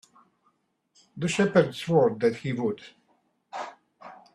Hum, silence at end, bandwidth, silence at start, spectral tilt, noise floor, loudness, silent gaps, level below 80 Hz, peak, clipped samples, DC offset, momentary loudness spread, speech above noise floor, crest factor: none; 0.2 s; 12.5 kHz; 1.15 s; -6 dB/octave; -71 dBFS; -25 LUFS; none; -66 dBFS; -6 dBFS; under 0.1%; under 0.1%; 19 LU; 46 dB; 22 dB